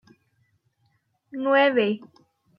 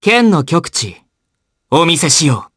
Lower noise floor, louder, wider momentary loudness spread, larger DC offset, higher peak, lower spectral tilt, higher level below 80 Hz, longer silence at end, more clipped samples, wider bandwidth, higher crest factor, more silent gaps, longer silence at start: about the same, -69 dBFS vs -71 dBFS; second, -22 LUFS vs -12 LUFS; first, 15 LU vs 9 LU; neither; second, -8 dBFS vs 0 dBFS; first, -7.5 dB/octave vs -3.5 dB/octave; second, -78 dBFS vs -52 dBFS; first, 0.6 s vs 0.1 s; neither; second, 5.6 kHz vs 11 kHz; first, 20 dB vs 14 dB; neither; first, 1.35 s vs 0 s